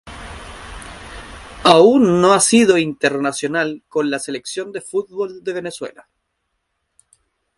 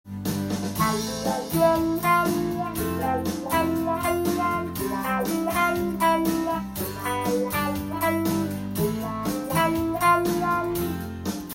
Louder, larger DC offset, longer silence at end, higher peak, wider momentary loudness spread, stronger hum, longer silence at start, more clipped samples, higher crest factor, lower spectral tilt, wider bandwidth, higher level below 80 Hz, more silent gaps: first, -16 LUFS vs -25 LUFS; neither; first, 1.65 s vs 0 s; first, 0 dBFS vs -8 dBFS; first, 23 LU vs 7 LU; neither; about the same, 0.05 s vs 0.05 s; neither; about the same, 18 dB vs 16 dB; about the same, -4 dB/octave vs -5 dB/octave; second, 11.5 kHz vs 17 kHz; about the same, -46 dBFS vs -48 dBFS; neither